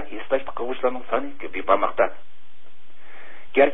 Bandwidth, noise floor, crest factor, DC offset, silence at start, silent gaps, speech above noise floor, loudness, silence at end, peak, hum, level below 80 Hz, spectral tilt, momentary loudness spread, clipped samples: 4 kHz; -58 dBFS; 22 dB; 6%; 0 s; none; 34 dB; -24 LUFS; 0 s; -2 dBFS; none; -58 dBFS; -9 dB/octave; 12 LU; under 0.1%